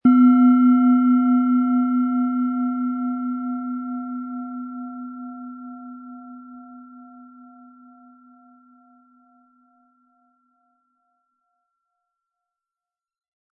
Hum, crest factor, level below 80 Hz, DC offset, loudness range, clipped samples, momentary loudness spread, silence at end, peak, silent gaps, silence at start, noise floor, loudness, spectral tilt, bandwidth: none; 16 dB; -76 dBFS; under 0.1%; 25 LU; under 0.1%; 25 LU; 6.3 s; -6 dBFS; none; 0.05 s; under -90 dBFS; -19 LUFS; -10.5 dB/octave; 3.2 kHz